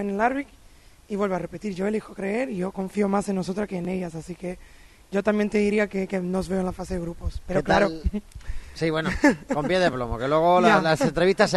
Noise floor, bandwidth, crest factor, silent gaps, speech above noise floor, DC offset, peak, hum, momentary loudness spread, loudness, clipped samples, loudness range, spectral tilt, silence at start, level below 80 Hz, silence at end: -51 dBFS; 12.5 kHz; 20 dB; none; 27 dB; under 0.1%; -4 dBFS; none; 14 LU; -24 LUFS; under 0.1%; 6 LU; -6 dB/octave; 0 s; -40 dBFS; 0 s